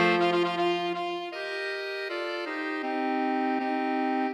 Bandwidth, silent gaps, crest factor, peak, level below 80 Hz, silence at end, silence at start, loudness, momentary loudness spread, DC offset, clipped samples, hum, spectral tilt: 11.5 kHz; none; 18 dB; -10 dBFS; -84 dBFS; 0 s; 0 s; -29 LUFS; 7 LU; under 0.1%; under 0.1%; none; -5.5 dB/octave